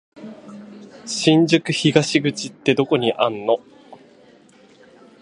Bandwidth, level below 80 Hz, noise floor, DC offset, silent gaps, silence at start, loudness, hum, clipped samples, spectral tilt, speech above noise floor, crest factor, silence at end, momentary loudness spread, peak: 11.5 kHz; -64 dBFS; -50 dBFS; under 0.1%; none; 0.15 s; -19 LUFS; none; under 0.1%; -5 dB/octave; 32 dB; 20 dB; 1.25 s; 23 LU; 0 dBFS